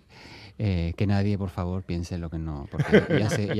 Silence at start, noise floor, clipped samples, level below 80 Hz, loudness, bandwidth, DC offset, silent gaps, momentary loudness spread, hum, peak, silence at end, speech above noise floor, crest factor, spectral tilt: 0.15 s; -47 dBFS; under 0.1%; -46 dBFS; -26 LUFS; 13 kHz; under 0.1%; none; 13 LU; none; -4 dBFS; 0 s; 22 dB; 22 dB; -7 dB/octave